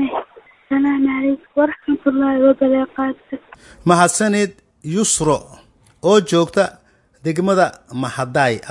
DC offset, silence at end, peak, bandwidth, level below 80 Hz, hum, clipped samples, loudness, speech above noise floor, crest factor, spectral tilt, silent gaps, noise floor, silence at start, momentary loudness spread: under 0.1%; 0 s; 0 dBFS; 11.5 kHz; -52 dBFS; none; under 0.1%; -17 LUFS; 26 dB; 18 dB; -4.5 dB/octave; none; -43 dBFS; 0 s; 10 LU